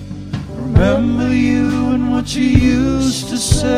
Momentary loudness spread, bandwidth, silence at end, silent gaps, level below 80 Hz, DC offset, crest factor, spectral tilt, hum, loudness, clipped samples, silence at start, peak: 10 LU; 14.5 kHz; 0 s; none; -26 dBFS; under 0.1%; 14 dB; -5.5 dB/octave; none; -15 LUFS; 0.1%; 0 s; 0 dBFS